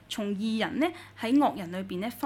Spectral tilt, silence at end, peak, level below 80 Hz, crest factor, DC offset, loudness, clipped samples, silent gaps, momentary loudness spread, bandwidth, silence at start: -5.5 dB/octave; 0 s; -14 dBFS; -64 dBFS; 16 dB; under 0.1%; -29 LUFS; under 0.1%; none; 10 LU; 17.5 kHz; 0.1 s